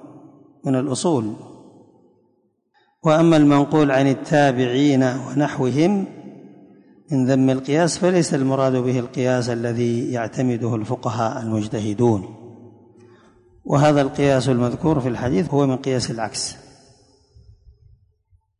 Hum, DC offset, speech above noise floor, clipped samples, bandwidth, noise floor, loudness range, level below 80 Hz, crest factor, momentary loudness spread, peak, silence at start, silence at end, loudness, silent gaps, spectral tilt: none; under 0.1%; 46 dB; under 0.1%; 11 kHz; -65 dBFS; 6 LU; -52 dBFS; 16 dB; 9 LU; -4 dBFS; 0.05 s; 2.05 s; -19 LUFS; none; -6.5 dB/octave